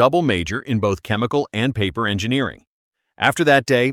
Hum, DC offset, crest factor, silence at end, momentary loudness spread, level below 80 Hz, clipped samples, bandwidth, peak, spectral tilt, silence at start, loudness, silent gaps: none; under 0.1%; 18 dB; 0 s; 7 LU; -48 dBFS; under 0.1%; 16 kHz; -2 dBFS; -5.5 dB/octave; 0 s; -19 LUFS; 2.67-2.92 s